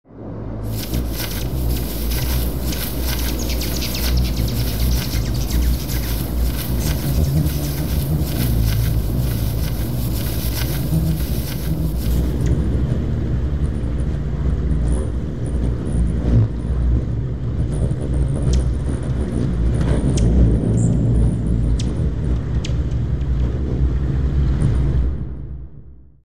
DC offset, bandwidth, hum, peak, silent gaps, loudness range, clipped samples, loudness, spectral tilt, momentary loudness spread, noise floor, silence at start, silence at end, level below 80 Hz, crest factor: 3%; 16 kHz; none; -2 dBFS; none; 3 LU; under 0.1%; -21 LUFS; -6 dB/octave; 6 LU; -41 dBFS; 0.05 s; 0 s; -22 dBFS; 16 dB